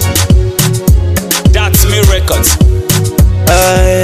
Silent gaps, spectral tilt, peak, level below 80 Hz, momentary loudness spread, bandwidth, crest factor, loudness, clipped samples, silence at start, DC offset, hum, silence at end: none; -4.5 dB/octave; 0 dBFS; -12 dBFS; 3 LU; 16 kHz; 8 dB; -9 LUFS; 1%; 0 s; under 0.1%; none; 0 s